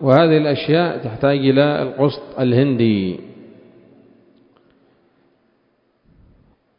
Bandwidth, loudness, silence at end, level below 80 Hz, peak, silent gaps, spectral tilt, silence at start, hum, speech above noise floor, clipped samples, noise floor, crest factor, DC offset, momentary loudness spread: 5.4 kHz; -17 LUFS; 3.35 s; -54 dBFS; 0 dBFS; none; -10 dB/octave; 0 s; none; 47 dB; under 0.1%; -63 dBFS; 18 dB; under 0.1%; 8 LU